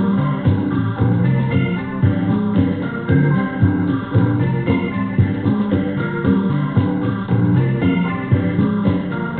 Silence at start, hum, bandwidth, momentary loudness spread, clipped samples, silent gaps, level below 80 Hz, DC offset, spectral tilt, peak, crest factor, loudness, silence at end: 0 s; none; 4.3 kHz; 3 LU; under 0.1%; none; -40 dBFS; under 0.1%; -13.5 dB/octave; -2 dBFS; 14 dB; -18 LUFS; 0 s